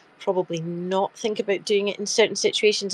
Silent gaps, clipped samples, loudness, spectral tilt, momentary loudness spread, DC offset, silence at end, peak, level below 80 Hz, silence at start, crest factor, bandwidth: none; under 0.1%; -23 LUFS; -3 dB/octave; 7 LU; under 0.1%; 0 s; -6 dBFS; -74 dBFS; 0.2 s; 18 dB; 11.5 kHz